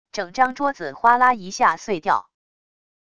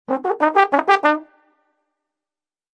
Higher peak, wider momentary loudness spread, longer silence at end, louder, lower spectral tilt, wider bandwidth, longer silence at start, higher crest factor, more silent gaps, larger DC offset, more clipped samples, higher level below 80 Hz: about the same, -2 dBFS vs 0 dBFS; about the same, 9 LU vs 7 LU; second, 0.8 s vs 1.55 s; second, -20 LUFS vs -17 LUFS; about the same, -3.5 dB/octave vs -3.5 dB/octave; about the same, 11 kHz vs 10 kHz; about the same, 0.15 s vs 0.1 s; about the same, 18 dB vs 20 dB; neither; neither; neither; first, -60 dBFS vs -78 dBFS